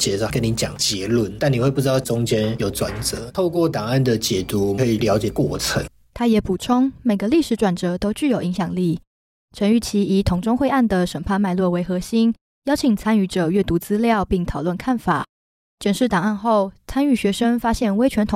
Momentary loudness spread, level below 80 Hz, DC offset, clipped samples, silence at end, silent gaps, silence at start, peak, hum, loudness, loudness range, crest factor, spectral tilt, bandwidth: 5 LU; -40 dBFS; under 0.1%; under 0.1%; 0 s; 9.07-9.48 s, 12.41-12.62 s, 15.29-15.78 s; 0 s; -6 dBFS; none; -20 LUFS; 1 LU; 14 dB; -5.5 dB/octave; 16.5 kHz